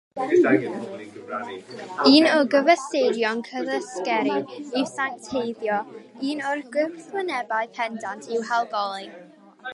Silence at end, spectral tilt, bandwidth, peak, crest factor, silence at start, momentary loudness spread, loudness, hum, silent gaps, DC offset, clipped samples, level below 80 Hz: 0 s; -4 dB/octave; 11.5 kHz; -2 dBFS; 22 dB; 0.15 s; 15 LU; -23 LUFS; none; none; under 0.1%; under 0.1%; -74 dBFS